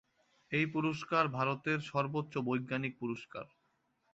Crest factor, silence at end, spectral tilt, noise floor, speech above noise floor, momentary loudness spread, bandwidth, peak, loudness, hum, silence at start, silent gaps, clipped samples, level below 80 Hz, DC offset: 20 dB; 0.65 s; -5 dB/octave; -78 dBFS; 42 dB; 11 LU; 8 kHz; -16 dBFS; -35 LUFS; none; 0.5 s; none; under 0.1%; -74 dBFS; under 0.1%